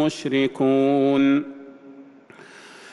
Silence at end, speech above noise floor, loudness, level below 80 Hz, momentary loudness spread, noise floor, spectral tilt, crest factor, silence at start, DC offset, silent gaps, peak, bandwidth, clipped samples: 0 s; 27 dB; -20 LUFS; -66 dBFS; 12 LU; -47 dBFS; -6 dB/octave; 12 dB; 0 s; under 0.1%; none; -10 dBFS; 11 kHz; under 0.1%